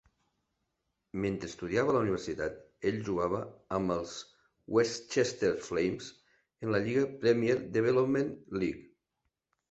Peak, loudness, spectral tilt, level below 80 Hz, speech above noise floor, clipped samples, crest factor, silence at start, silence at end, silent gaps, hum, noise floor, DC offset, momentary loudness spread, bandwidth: -14 dBFS; -32 LUFS; -5.5 dB/octave; -60 dBFS; 53 dB; under 0.1%; 18 dB; 1.15 s; 0.85 s; none; none; -83 dBFS; under 0.1%; 10 LU; 8.2 kHz